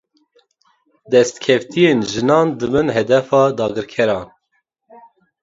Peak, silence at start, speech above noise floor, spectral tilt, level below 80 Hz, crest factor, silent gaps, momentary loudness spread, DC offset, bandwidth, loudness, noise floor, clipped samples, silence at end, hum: 0 dBFS; 1.1 s; 53 dB; -5.5 dB/octave; -52 dBFS; 18 dB; none; 5 LU; under 0.1%; 8 kHz; -16 LUFS; -68 dBFS; under 0.1%; 1.15 s; none